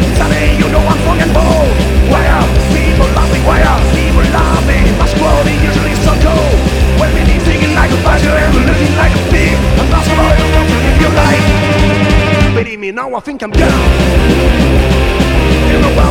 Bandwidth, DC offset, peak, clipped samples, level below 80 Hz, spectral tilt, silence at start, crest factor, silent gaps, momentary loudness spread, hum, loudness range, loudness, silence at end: 16 kHz; under 0.1%; 0 dBFS; 0.6%; -12 dBFS; -6 dB/octave; 0 s; 8 dB; none; 2 LU; none; 1 LU; -10 LUFS; 0 s